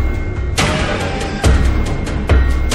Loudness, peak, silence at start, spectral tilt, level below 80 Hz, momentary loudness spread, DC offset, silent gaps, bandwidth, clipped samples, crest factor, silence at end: -17 LUFS; -2 dBFS; 0 s; -5 dB/octave; -16 dBFS; 6 LU; under 0.1%; none; 12.5 kHz; under 0.1%; 12 dB; 0 s